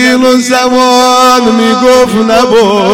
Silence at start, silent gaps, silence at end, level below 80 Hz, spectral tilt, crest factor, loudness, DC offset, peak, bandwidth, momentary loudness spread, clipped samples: 0 s; none; 0 s; -40 dBFS; -3.5 dB/octave; 6 dB; -6 LUFS; 1%; 0 dBFS; 17 kHz; 3 LU; under 0.1%